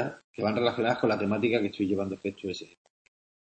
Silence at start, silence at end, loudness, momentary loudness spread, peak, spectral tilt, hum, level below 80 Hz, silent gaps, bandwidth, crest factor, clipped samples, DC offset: 0 s; 0.85 s; -29 LUFS; 10 LU; -10 dBFS; -6.5 dB/octave; none; -68 dBFS; 0.24-0.34 s; 8.6 kHz; 18 dB; under 0.1%; under 0.1%